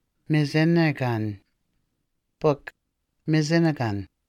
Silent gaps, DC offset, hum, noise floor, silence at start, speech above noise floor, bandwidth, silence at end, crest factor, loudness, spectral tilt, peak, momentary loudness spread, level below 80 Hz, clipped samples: none; under 0.1%; none; -76 dBFS; 0.3 s; 53 dB; 10 kHz; 0.25 s; 16 dB; -24 LUFS; -7 dB/octave; -8 dBFS; 13 LU; -62 dBFS; under 0.1%